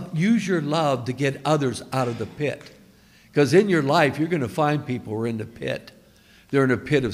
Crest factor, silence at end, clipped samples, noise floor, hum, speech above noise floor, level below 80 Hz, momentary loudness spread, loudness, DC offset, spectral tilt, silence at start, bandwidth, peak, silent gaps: 18 dB; 0 s; under 0.1%; -53 dBFS; none; 31 dB; -58 dBFS; 11 LU; -23 LUFS; under 0.1%; -6.5 dB/octave; 0 s; 15.5 kHz; -4 dBFS; none